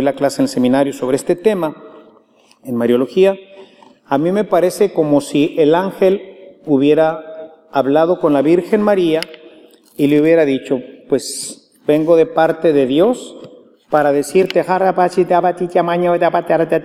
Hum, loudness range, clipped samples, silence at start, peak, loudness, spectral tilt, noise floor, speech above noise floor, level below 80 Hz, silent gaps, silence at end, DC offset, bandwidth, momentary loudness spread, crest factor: none; 3 LU; under 0.1%; 0 s; 0 dBFS; -15 LUFS; -6 dB/octave; -50 dBFS; 37 dB; -60 dBFS; none; 0 s; under 0.1%; 15.5 kHz; 10 LU; 14 dB